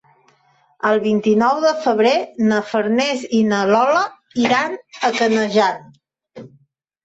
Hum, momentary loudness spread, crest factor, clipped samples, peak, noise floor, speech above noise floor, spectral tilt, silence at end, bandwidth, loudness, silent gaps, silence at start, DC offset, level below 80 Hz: none; 6 LU; 14 dB; under 0.1%; -4 dBFS; -58 dBFS; 41 dB; -5 dB/octave; 0.6 s; 8 kHz; -17 LUFS; none; 0.85 s; under 0.1%; -64 dBFS